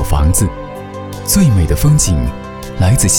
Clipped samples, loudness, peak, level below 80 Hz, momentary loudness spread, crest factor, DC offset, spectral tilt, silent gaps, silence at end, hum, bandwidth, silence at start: under 0.1%; -13 LUFS; -2 dBFS; -20 dBFS; 16 LU; 10 dB; under 0.1%; -5 dB/octave; none; 0 s; none; 20 kHz; 0 s